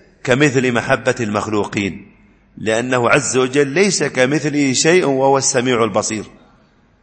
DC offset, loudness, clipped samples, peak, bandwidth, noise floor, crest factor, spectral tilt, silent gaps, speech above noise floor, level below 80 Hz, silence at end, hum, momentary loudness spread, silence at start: under 0.1%; -16 LUFS; under 0.1%; 0 dBFS; 8.8 kHz; -53 dBFS; 16 dB; -4 dB/octave; none; 37 dB; -52 dBFS; 0.75 s; none; 8 LU; 0.25 s